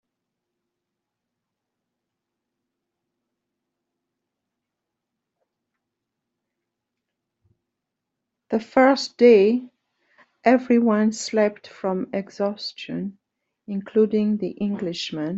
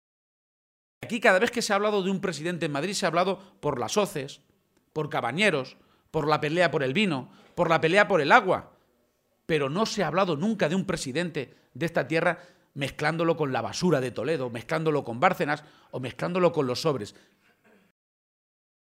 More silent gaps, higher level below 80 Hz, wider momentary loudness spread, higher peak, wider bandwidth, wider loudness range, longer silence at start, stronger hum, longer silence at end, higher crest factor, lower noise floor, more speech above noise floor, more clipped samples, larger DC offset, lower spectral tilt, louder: neither; second, -70 dBFS vs -62 dBFS; about the same, 14 LU vs 13 LU; about the same, -4 dBFS vs -2 dBFS; second, 8 kHz vs 16 kHz; about the same, 7 LU vs 5 LU; first, 8.5 s vs 1 s; neither; second, 0 s vs 1.8 s; about the same, 22 dB vs 24 dB; first, -83 dBFS vs -70 dBFS; first, 63 dB vs 44 dB; neither; neither; about the same, -5.5 dB/octave vs -5 dB/octave; first, -21 LUFS vs -26 LUFS